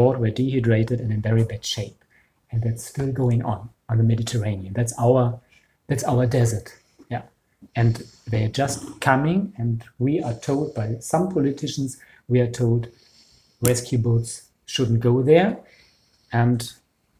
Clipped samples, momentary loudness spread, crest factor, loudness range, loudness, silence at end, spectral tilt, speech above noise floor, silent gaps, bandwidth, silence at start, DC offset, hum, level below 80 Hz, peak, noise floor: under 0.1%; 12 LU; 22 dB; 3 LU; -23 LUFS; 0.45 s; -6.5 dB/octave; 39 dB; none; 16 kHz; 0 s; under 0.1%; none; -50 dBFS; -2 dBFS; -60 dBFS